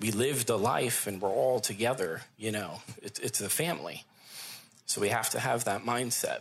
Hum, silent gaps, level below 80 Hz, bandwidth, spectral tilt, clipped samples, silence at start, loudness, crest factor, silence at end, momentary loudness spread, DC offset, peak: none; none; -74 dBFS; 16 kHz; -3 dB/octave; under 0.1%; 0 s; -30 LUFS; 18 dB; 0 s; 14 LU; under 0.1%; -14 dBFS